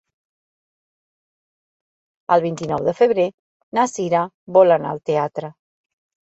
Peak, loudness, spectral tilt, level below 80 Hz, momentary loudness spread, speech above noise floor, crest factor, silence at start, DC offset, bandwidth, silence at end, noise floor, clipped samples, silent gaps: -2 dBFS; -19 LUFS; -6 dB/octave; -62 dBFS; 11 LU; over 72 dB; 20 dB; 2.3 s; under 0.1%; 8.2 kHz; 0.8 s; under -90 dBFS; under 0.1%; 3.34-3.72 s, 4.34-4.47 s